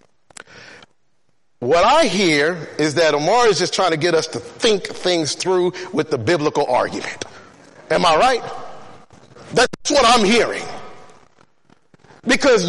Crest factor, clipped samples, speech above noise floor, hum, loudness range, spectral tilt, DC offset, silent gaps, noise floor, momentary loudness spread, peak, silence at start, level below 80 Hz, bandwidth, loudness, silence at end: 14 dB; under 0.1%; 52 dB; none; 4 LU; -3.5 dB/octave; under 0.1%; none; -69 dBFS; 15 LU; -4 dBFS; 0.55 s; -48 dBFS; 11.5 kHz; -17 LUFS; 0 s